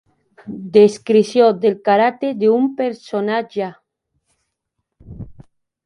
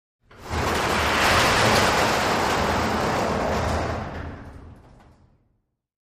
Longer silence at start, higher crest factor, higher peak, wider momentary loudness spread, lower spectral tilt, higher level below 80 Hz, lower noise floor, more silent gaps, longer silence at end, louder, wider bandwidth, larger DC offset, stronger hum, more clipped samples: about the same, 0.45 s vs 0.4 s; about the same, 18 dB vs 18 dB; first, 0 dBFS vs -6 dBFS; first, 20 LU vs 14 LU; first, -6 dB/octave vs -3.5 dB/octave; second, -54 dBFS vs -38 dBFS; first, -76 dBFS vs -71 dBFS; neither; second, 0.55 s vs 1.45 s; first, -16 LUFS vs -21 LUFS; second, 11 kHz vs 15.5 kHz; neither; neither; neither